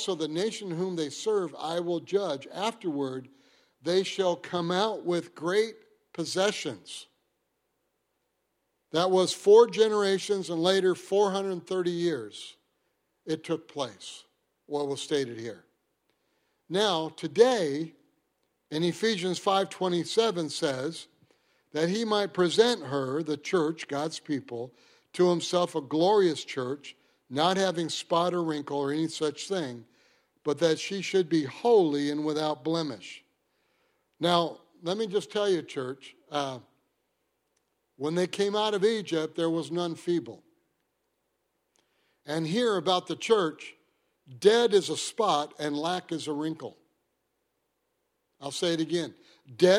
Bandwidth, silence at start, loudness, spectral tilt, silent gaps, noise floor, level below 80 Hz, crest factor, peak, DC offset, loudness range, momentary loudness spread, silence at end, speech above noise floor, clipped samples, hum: 14 kHz; 0 s; -28 LUFS; -4.5 dB/octave; none; -78 dBFS; -78 dBFS; 24 dB; -6 dBFS; under 0.1%; 8 LU; 14 LU; 0 s; 51 dB; under 0.1%; none